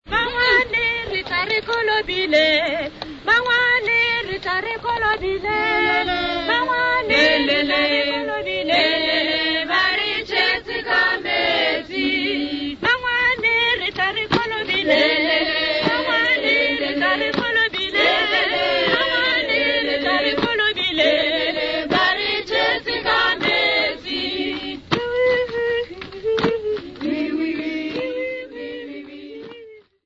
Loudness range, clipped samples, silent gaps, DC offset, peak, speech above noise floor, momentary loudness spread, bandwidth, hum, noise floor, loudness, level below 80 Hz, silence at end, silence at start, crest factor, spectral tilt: 5 LU; under 0.1%; none; under 0.1%; -4 dBFS; 24 dB; 9 LU; 8 kHz; none; -43 dBFS; -18 LUFS; -48 dBFS; 0.25 s; 0.05 s; 16 dB; -4 dB/octave